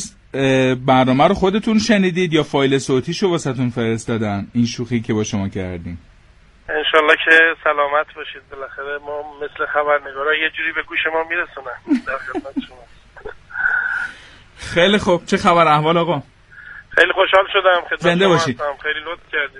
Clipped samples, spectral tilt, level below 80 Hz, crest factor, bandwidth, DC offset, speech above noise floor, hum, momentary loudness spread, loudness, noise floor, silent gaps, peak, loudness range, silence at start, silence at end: under 0.1%; -5 dB/octave; -46 dBFS; 18 dB; 11.5 kHz; under 0.1%; 31 dB; none; 16 LU; -17 LUFS; -48 dBFS; none; 0 dBFS; 7 LU; 0 s; 0 s